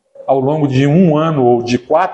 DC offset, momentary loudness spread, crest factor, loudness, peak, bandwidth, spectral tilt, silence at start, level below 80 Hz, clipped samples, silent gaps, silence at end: under 0.1%; 5 LU; 12 dB; -13 LUFS; 0 dBFS; 8.2 kHz; -8 dB/octave; 0.2 s; -50 dBFS; under 0.1%; none; 0 s